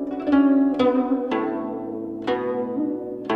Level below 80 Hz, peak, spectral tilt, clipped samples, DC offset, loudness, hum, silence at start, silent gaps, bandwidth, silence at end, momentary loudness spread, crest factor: -56 dBFS; -8 dBFS; -7.5 dB/octave; under 0.1%; under 0.1%; -23 LUFS; none; 0 s; none; 5.6 kHz; 0 s; 12 LU; 14 dB